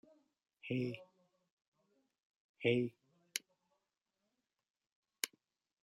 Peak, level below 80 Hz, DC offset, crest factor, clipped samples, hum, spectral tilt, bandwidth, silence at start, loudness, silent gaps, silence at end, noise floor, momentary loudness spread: -16 dBFS; -86 dBFS; under 0.1%; 30 dB; under 0.1%; none; -4.5 dB/octave; 13.5 kHz; 0.65 s; -40 LUFS; 1.52-1.57 s, 1.67-1.72 s, 2.25-2.54 s, 4.70-4.74 s, 4.92-5.03 s; 0.55 s; -88 dBFS; 10 LU